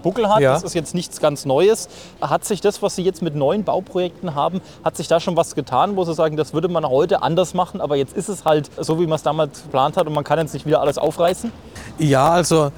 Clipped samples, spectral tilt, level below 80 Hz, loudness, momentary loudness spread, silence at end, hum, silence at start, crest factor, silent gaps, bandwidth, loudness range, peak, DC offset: under 0.1%; -5.5 dB/octave; -50 dBFS; -19 LUFS; 8 LU; 0 s; none; 0 s; 16 dB; none; 19.5 kHz; 2 LU; -4 dBFS; 0.2%